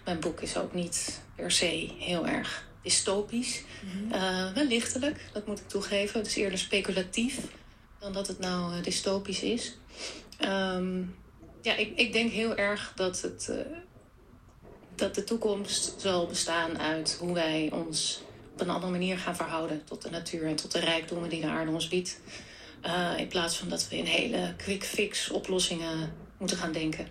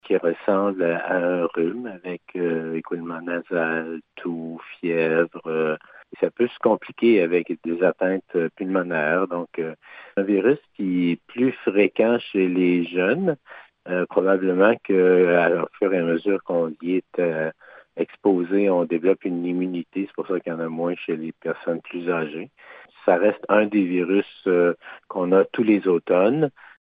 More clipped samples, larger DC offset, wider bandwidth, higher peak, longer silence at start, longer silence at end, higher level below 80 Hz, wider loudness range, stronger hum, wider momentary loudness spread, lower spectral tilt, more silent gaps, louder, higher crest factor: neither; neither; first, 14.5 kHz vs 4.8 kHz; second, -12 dBFS vs -4 dBFS; about the same, 0 s vs 0.05 s; second, 0 s vs 0.45 s; first, -56 dBFS vs -74 dBFS; second, 3 LU vs 6 LU; neither; about the same, 11 LU vs 11 LU; second, -3 dB/octave vs -10 dB/octave; neither; second, -31 LUFS vs -22 LUFS; about the same, 20 dB vs 18 dB